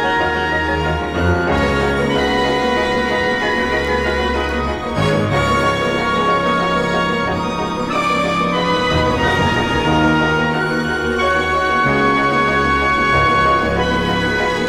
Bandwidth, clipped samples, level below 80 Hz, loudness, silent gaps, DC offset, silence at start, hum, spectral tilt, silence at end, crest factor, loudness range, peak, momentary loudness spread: 16 kHz; under 0.1%; -32 dBFS; -16 LUFS; none; under 0.1%; 0 s; none; -5.5 dB/octave; 0 s; 14 dB; 2 LU; -2 dBFS; 4 LU